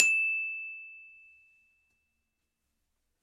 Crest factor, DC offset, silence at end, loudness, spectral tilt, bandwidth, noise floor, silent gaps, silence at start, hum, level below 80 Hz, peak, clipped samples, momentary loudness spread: 34 dB; under 0.1%; 2.1 s; -29 LUFS; 2.5 dB/octave; 14 kHz; -82 dBFS; none; 0 s; none; -82 dBFS; 0 dBFS; under 0.1%; 25 LU